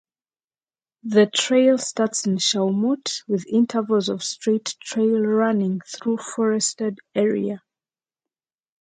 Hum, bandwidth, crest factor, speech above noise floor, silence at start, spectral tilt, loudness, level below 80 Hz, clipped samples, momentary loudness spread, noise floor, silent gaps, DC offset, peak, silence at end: none; 9.6 kHz; 18 dB; over 69 dB; 1.05 s; -4 dB/octave; -21 LUFS; -72 dBFS; under 0.1%; 8 LU; under -90 dBFS; none; under 0.1%; -6 dBFS; 1.25 s